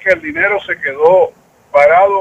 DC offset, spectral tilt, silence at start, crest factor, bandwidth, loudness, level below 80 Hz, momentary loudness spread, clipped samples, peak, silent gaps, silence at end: under 0.1%; -5.5 dB/octave; 0.05 s; 12 dB; 8 kHz; -12 LUFS; -52 dBFS; 8 LU; under 0.1%; 0 dBFS; none; 0 s